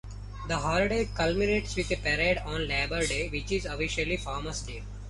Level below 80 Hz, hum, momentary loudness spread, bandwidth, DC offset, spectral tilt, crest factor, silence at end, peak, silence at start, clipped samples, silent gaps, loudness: -38 dBFS; 50 Hz at -35 dBFS; 9 LU; 11.5 kHz; under 0.1%; -4.5 dB/octave; 16 dB; 0 s; -14 dBFS; 0.05 s; under 0.1%; none; -29 LUFS